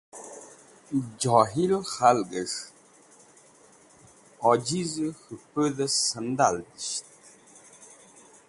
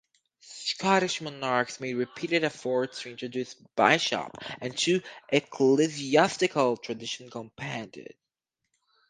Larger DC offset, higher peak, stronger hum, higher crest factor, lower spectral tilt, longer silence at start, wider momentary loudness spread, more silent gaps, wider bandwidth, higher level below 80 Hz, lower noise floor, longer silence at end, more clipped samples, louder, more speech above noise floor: neither; about the same, -4 dBFS vs -4 dBFS; neither; about the same, 24 dB vs 24 dB; about the same, -4 dB/octave vs -4 dB/octave; second, 0.15 s vs 0.45 s; first, 18 LU vs 14 LU; neither; first, 11.5 kHz vs 9.8 kHz; first, -66 dBFS vs -72 dBFS; second, -56 dBFS vs -85 dBFS; second, 0.55 s vs 1.05 s; neither; about the same, -26 LUFS vs -27 LUFS; second, 30 dB vs 57 dB